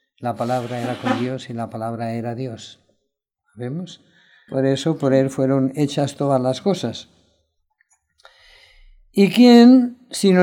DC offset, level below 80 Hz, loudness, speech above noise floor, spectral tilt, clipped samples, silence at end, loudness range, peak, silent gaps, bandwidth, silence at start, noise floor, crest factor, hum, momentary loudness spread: under 0.1%; -62 dBFS; -18 LUFS; 58 dB; -6.5 dB/octave; under 0.1%; 0 s; 11 LU; 0 dBFS; none; 13 kHz; 0.2 s; -75 dBFS; 20 dB; none; 18 LU